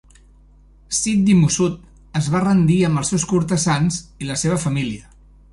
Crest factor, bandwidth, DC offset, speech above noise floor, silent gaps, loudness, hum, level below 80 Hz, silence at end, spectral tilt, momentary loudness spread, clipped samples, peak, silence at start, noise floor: 14 dB; 11.5 kHz; under 0.1%; 31 dB; none; -19 LUFS; none; -44 dBFS; 0.55 s; -5 dB/octave; 12 LU; under 0.1%; -4 dBFS; 0.9 s; -48 dBFS